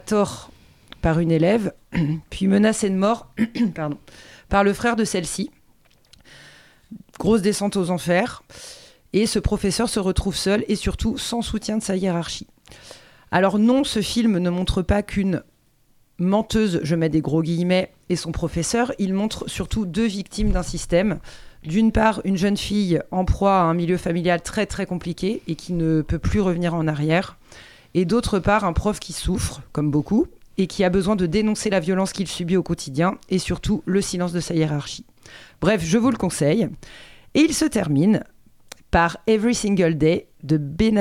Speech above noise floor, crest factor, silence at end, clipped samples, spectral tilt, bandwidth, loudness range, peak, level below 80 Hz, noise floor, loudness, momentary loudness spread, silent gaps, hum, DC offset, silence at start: 38 dB; 18 dB; 0 s; under 0.1%; -5.5 dB/octave; 15 kHz; 3 LU; -4 dBFS; -36 dBFS; -59 dBFS; -22 LUFS; 8 LU; none; none; under 0.1%; 0.05 s